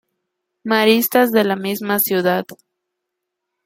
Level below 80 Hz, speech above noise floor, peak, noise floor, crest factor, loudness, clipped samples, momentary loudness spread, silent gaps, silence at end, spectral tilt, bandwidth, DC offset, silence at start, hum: -64 dBFS; 62 dB; -2 dBFS; -79 dBFS; 18 dB; -17 LUFS; under 0.1%; 9 LU; none; 1.1 s; -4 dB/octave; 16.5 kHz; under 0.1%; 0.65 s; none